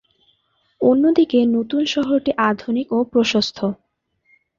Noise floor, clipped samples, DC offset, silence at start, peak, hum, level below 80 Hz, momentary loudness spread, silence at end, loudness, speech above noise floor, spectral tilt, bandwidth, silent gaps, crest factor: -65 dBFS; under 0.1%; under 0.1%; 0.8 s; -4 dBFS; none; -58 dBFS; 8 LU; 0.85 s; -18 LUFS; 47 dB; -5 dB/octave; 7.4 kHz; none; 16 dB